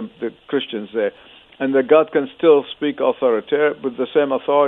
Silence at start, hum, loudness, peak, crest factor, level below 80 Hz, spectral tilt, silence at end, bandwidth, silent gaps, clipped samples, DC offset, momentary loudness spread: 0 s; none; -19 LUFS; -2 dBFS; 16 dB; -66 dBFS; -8.5 dB/octave; 0 s; 4 kHz; none; under 0.1%; under 0.1%; 10 LU